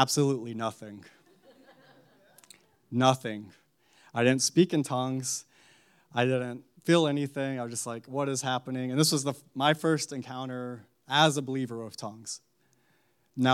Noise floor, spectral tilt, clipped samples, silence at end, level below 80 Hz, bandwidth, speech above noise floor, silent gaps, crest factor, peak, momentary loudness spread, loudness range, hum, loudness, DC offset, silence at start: -70 dBFS; -4.5 dB/octave; under 0.1%; 0 s; -82 dBFS; 16 kHz; 41 dB; none; 22 dB; -8 dBFS; 16 LU; 4 LU; none; -29 LUFS; under 0.1%; 0 s